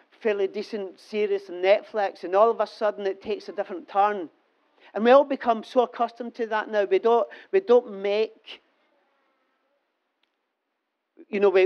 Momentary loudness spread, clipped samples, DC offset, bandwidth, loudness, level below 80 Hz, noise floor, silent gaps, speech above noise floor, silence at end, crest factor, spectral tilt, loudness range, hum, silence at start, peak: 12 LU; under 0.1%; under 0.1%; 6.8 kHz; -24 LUFS; -78 dBFS; -79 dBFS; none; 56 dB; 0 s; 20 dB; -5.5 dB/octave; 6 LU; none; 0.25 s; -6 dBFS